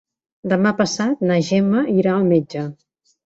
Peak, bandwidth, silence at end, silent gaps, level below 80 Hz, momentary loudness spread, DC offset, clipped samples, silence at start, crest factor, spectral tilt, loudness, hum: -4 dBFS; 8 kHz; 0.5 s; none; -60 dBFS; 11 LU; under 0.1%; under 0.1%; 0.45 s; 16 dB; -6 dB/octave; -18 LUFS; none